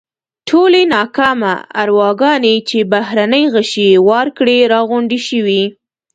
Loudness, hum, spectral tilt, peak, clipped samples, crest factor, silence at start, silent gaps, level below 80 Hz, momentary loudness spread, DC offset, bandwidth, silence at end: -12 LUFS; none; -5 dB/octave; 0 dBFS; under 0.1%; 12 dB; 0.45 s; none; -58 dBFS; 6 LU; under 0.1%; 9.2 kHz; 0.4 s